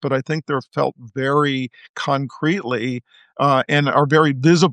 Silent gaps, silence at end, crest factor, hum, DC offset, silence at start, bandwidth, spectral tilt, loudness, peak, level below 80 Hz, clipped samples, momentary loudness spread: 1.89-1.94 s; 0 s; 16 dB; none; under 0.1%; 0 s; 9.2 kHz; -6 dB/octave; -19 LUFS; -2 dBFS; -66 dBFS; under 0.1%; 11 LU